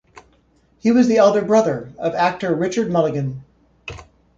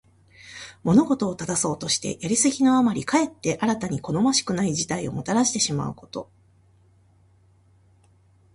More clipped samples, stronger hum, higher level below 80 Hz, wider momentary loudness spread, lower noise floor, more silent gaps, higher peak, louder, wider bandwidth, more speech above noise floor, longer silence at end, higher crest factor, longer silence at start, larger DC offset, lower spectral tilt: neither; neither; first, -52 dBFS vs -58 dBFS; first, 21 LU vs 13 LU; about the same, -58 dBFS vs -58 dBFS; neither; first, -2 dBFS vs -8 dBFS; first, -18 LUFS vs -23 LUFS; second, 7.6 kHz vs 11.5 kHz; first, 41 dB vs 35 dB; second, 0.35 s vs 2.3 s; about the same, 16 dB vs 18 dB; first, 0.85 s vs 0.45 s; neither; first, -6.5 dB/octave vs -4 dB/octave